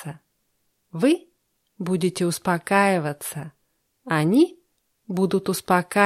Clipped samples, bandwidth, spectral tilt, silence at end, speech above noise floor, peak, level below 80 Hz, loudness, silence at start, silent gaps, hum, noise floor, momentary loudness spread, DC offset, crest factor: under 0.1%; 15 kHz; -5.5 dB/octave; 0 s; 49 dB; -4 dBFS; -66 dBFS; -23 LUFS; 0 s; none; none; -71 dBFS; 14 LU; under 0.1%; 20 dB